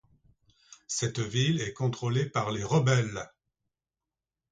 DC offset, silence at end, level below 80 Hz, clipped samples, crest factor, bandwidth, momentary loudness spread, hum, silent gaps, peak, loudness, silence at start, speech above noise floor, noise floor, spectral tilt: under 0.1%; 1.25 s; -60 dBFS; under 0.1%; 18 dB; 9.4 kHz; 10 LU; none; none; -12 dBFS; -29 LUFS; 0.7 s; over 62 dB; under -90 dBFS; -5 dB/octave